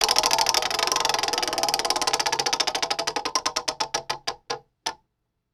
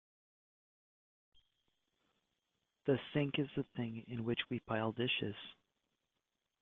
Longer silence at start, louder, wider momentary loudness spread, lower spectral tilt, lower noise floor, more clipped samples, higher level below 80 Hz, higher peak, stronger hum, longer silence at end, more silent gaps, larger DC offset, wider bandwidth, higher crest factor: second, 0 s vs 2.85 s; first, -23 LUFS vs -39 LUFS; first, 12 LU vs 8 LU; second, 0.5 dB/octave vs -4.5 dB/octave; second, -77 dBFS vs -88 dBFS; neither; first, -56 dBFS vs -74 dBFS; first, 0 dBFS vs -22 dBFS; neither; second, 0.6 s vs 1.1 s; neither; neither; first, 19.5 kHz vs 4.3 kHz; about the same, 26 dB vs 22 dB